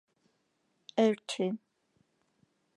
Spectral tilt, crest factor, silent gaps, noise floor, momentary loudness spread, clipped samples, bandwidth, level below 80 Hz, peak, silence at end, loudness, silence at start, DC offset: -5 dB/octave; 22 dB; none; -77 dBFS; 9 LU; under 0.1%; 11.5 kHz; -90 dBFS; -14 dBFS; 1.2 s; -31 LUFS; 0.95 s; under 0.1%